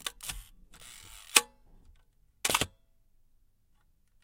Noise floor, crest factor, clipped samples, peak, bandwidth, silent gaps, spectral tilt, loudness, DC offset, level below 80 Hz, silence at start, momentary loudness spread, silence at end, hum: -67 dBFS; 36 dB; under 0.1%; -2 dBFS; 17 kHz; none; 0 dB/octave; -29 LUFS; under 0.1%; -56 dBFS; 0 s; 24 LU; 1.55 s; none